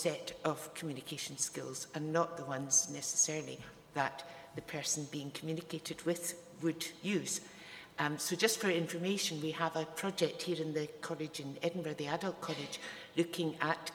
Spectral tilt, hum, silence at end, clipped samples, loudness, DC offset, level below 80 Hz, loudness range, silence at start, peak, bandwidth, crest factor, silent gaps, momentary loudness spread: -3 dB/octave; none; 0 s; under 0.1%; -37 LUFS; under 0.1%; -76 dBFS; 4 LU; 0 s; -14 dBFS; over 20 kHz; 24 dB; none; 11 LU